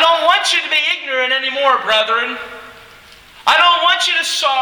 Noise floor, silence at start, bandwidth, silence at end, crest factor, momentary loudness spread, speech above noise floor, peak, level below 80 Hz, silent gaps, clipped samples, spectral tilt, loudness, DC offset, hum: -42 dBFS; 0 s; over 20 kHz; 0 s; 16 dB; 10 LU; 27 dB; 0 dBFS; -58 dBFS; none; under 0.1%; 1 dB/octave; -13 LUFS; under 0.1%; none